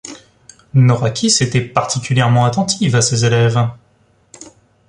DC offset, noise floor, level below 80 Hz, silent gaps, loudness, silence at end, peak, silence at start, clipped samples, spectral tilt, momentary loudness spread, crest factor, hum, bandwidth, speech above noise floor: under 0.1%; -55 dBFS; -48 dBFS; none; -14 LUFS; 0.45 s; 0 dBFS; 0.05 s; under 0.1%; -4.5 dB/octave; 5 LU; 16 dB; none; 11 kHz; 41 dB